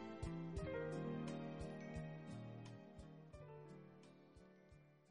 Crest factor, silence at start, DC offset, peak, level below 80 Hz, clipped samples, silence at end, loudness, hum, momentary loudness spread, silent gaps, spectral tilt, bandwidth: 16 dB; 0 s; under 0.1%; -36 dBFS; -64 dBFS; under 0.1%; 0 s; -51 LUFS; none; 19 LU; none; -7.5 dB/octave; 10.5 kHz